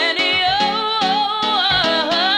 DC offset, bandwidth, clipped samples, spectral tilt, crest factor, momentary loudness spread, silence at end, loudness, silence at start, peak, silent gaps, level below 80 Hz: under 0.1%; 18.5 kHz; under 0.1%; -3 dB/octave; 12 dB; 3 LU; 0 s; -16 LUFS; 0 s; -4 dBFS; none; -48 dBFS